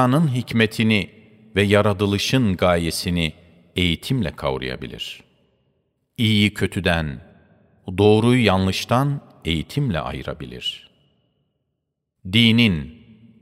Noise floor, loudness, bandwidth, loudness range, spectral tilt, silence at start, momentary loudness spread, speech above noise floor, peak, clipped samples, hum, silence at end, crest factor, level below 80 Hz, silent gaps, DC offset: -77 dBFS; -20 LUFS; 16 kHz; 6 LU; -5.5 dB/octave; 0 s; 16 LU; 58 dB; -2 dBFS; under 0.1%; none; 0.5 s; 20 dB; -44 dBFS; none; under 0.1%